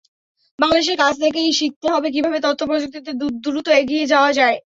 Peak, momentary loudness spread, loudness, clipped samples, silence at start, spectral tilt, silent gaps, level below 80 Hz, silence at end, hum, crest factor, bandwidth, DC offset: -2 dBFS; 8 LU; -18 LUFS; under 0.1%; 0.6 s; -2.5 dB/octave; 1.76-1.81 s; -56 dBFS; 0.2 s; none; 16 dB; 8 kHz; under 0.1%